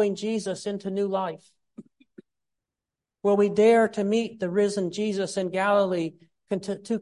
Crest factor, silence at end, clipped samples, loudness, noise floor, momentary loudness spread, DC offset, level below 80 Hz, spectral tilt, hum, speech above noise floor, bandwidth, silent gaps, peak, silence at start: 16 dB; 0 s; under 0.1%; -25 LUFS; -89 dBFS; 12 LU; under 0.1%; -72 dBFS; -5.5 dB/octave; none; 64 dB; 11.5 kHz; none; -8 dBFS; 0 s